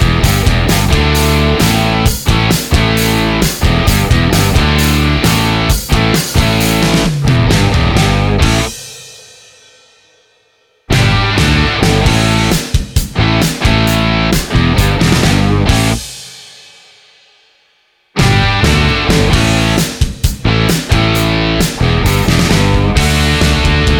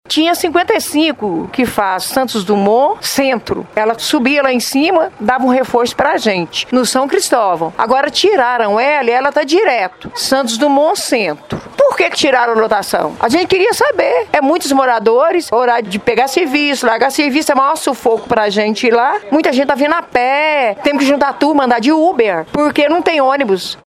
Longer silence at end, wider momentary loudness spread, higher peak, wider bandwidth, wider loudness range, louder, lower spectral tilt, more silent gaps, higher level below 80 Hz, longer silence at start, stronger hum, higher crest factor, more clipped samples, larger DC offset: about the same, 0 s vs 0.1 s; about the same, 5 LU vs 4 LU; about the same, 0 dBFS vs 0 dBFS; first, 19.5 kHz vs 16.5 kHz; first, 4 LU vs 1 LU; about the same, -11 LUFS vs -13 LUFS; about the same, -4.5 dB/octave vs -3.5 dB/octave; neither; first, -18 dBFS vs -50 dBFS; about the same, 0 s vs 0.1 s; neither; about the same, 12 dB vs 12 dB; neither; neither